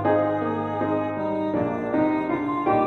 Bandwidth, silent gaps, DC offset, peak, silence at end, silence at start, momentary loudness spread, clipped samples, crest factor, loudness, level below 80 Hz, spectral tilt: 6.2 kHz; none; under 0.1%; -10 dBFS; 0 s; 0 s; 4 LU; under 0.1%; 14 dB; -24 LUFS; -58 dBFS; -9 dB/octave